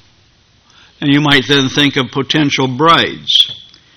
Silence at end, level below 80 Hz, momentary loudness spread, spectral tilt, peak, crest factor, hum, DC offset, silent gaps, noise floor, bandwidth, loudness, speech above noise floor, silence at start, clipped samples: 0.35 s; -48 dBFS; 6 LU; -4.5 dB/octave; 0 dBFS; 14 dB; none; under 0.1%; none; -51 dBFS; 18 kHz; -11 LUFS; 39 dB; 1 s; 0.3%